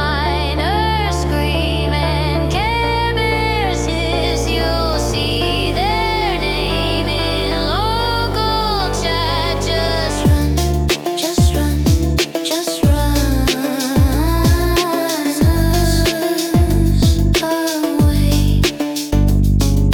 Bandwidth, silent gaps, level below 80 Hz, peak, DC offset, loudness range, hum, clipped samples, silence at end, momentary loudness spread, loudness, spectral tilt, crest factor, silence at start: 18 kHz; none; -20 dBFS; -4 dBFS; under 0.1%; 2 LU; none; under 0.1%; 0 s; 3 LU; -16 LUFS; -5 dB/octave; 12 dB; 0 s